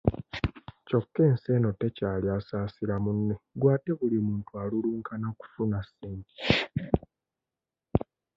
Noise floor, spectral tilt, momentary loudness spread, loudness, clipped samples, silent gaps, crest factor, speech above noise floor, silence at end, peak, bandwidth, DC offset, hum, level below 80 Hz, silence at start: -90 dBFS; -8.5 dB/octave; 10 LU; -29 LUFS; under 0.1%; none; 22 dB; 61 dB; 0.35 s; -6 dBFS; 7.4 kHz; under 0.1%; none; -46 dBFS; 0.05 s